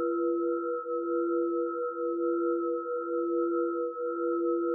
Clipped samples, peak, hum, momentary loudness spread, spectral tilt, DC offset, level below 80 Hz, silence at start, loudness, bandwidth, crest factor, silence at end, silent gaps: under 0.1%; -20 dBFS; none; 3 LU; 10 dB/octave; under 0.1%; under -90 dBFS; 0 s; -30 LUFS; 1.5 kHz; 10 dB; 0 s; none